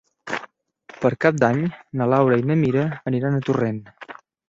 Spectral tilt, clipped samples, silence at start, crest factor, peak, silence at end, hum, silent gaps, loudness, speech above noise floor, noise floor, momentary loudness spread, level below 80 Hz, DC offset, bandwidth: -8 dB/octave; under 0.1%; 0.25 s; 20 dB; -2 dBFS; 0.35 s; none; none; -21 LUFS; 29 dB; -49 dBFS; 13 LU; -58 dBFS; under 0.1%; 7.8 kHz